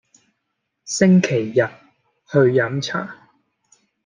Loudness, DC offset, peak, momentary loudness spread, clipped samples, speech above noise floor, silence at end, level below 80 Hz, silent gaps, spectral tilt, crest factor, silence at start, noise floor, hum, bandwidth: -18 LUFS; under 0.1%; -2 dBFS; 12 LU; under 0.1%; 59 dB; 0.9 s; -64 dBFS; none; -6 dB/octave; 18 dB; 0.85 s; -76 dBFS; none; 9.6 kHz